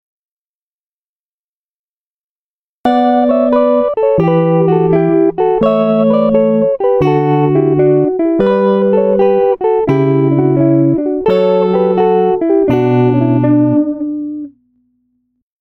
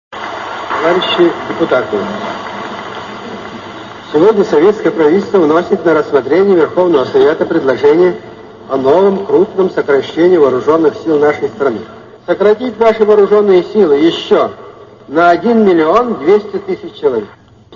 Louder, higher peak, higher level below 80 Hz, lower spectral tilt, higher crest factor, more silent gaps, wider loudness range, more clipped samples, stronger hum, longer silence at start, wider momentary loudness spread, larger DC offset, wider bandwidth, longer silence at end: about the same, -11 LUFS vs -11 LUFS; about the same, -2 dBFS vs 0 dBFS; about the same, -46 dBFS vs -50 dBFS; first, -10.5 dB/octave vs -6.5 dB/octave; about the same, 10 dB vs 12 dB; neither; about the same, 3 LU vs 5 LU; neither; neither; first, 2.85 s vs 0.1 s; second, 3 LU vs 14 LU; neither; second, 5.6 kHz vs 7.2 kHz; first, 1.1 s vs 0 s